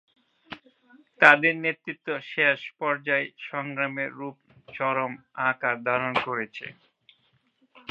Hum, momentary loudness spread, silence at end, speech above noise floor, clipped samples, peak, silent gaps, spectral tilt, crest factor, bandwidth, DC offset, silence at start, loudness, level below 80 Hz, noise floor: none; 23 LU; 1.2 s; 42 dB; under 0.1%; 0 dBFS; none; -5.5 dB/octave; 28 dB; 10 kHz; under 0.1%; 0.5 s; -25 LUFS; -74 dBFS; -68 dBFS